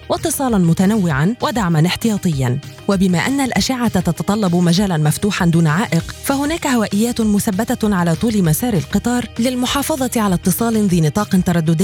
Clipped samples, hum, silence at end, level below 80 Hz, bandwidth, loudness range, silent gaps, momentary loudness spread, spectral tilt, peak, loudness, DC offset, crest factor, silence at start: under 0.1%; none; 0 s; -38 dBFS; 17.5 kHz; 1 LU; none; 4 LU; -5.5 dB/octave; -4 dBFS; -16 LUFS; under 0.1%; 12 dB; 0 s